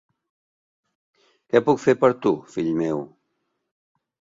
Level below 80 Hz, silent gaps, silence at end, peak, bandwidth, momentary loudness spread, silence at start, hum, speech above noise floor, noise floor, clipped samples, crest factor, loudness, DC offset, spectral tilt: -64 dBFS; none; 1.3 s; -4 dBFS; 7.8 kHz; 9 LU; 1.55 s; none; 55 dB; -75 dBFS; under 0.1%; 22 dB; -22 LUFS; under 0.1%; -7 dB/octave